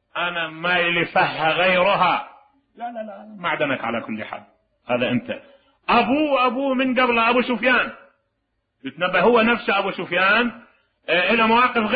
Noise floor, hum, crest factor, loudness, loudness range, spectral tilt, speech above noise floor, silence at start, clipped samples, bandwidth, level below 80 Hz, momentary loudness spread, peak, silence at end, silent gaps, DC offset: -73 dBFS; none; 16 dB; -19 LUFS; 6 LU; -9.5 dB/octave; 54 dB; 0.15 s; under 0.1%; 5 kHz; -56 dBFS; 17 LU; -6 dBFS; 0 s; none; under 0.1%